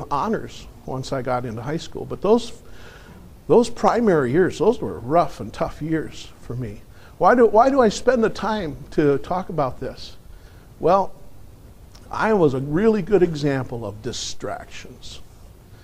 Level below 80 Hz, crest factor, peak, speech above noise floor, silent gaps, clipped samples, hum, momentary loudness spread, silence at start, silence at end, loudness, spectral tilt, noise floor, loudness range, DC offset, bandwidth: -44 dBFS; 18 dB; -2 dBFS; 24 dB; none; under 0.1%; none; 18 LU; 0 s; 0.1 s; -21 LUFS; -6 dB/octave; -44 dBFS; 5 LU; under 0.1%; 15 kHz